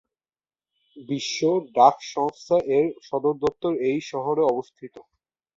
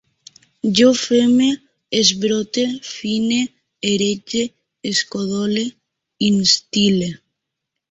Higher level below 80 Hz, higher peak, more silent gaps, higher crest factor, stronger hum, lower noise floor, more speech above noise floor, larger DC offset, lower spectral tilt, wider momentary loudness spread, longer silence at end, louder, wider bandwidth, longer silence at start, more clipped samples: second, -64 dBFS vs -58 dBFS; about the same, -2 dBFS vs 0 dBFS; neither; about the same, 22 dB vs 18 dB; neither; first, under -90 dBFS vs -80 dBFS; first, over 67 dB vs 63 dB; neither; about the same, -5 dB/octave vs -4 dB/octave; about the same, 12 LU vs 12 LU; second, 0.55 s vs 0.75 s; second, -23 LUFS vs -18 LUFS; about the same, 7.8 kHz vs 8 kHz; first, 0.95 s vs 0.65 s; neither